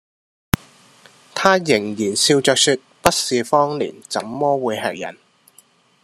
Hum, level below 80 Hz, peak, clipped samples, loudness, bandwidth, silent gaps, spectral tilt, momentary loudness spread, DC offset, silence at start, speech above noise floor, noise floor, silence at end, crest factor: none; -48 dBFS; 0 dBFS; under 0.1%; -18 LUFS; 14 kHz; none; -3 dB/octave; 11 LU; under 0.1%; 1.35 s; 36 dB; -54 dBFS; 0.9 s; 20 dB